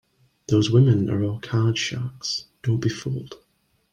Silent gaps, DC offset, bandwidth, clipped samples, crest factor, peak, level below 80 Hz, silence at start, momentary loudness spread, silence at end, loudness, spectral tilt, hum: none; under 0.1%; 9.4 kHz; under 0.1%; 18 dB; -6 dBFS; -56 dBFS; 0.5 s; 13 LU; 0.55 s; -23 LUFS; -6 dB/octave; none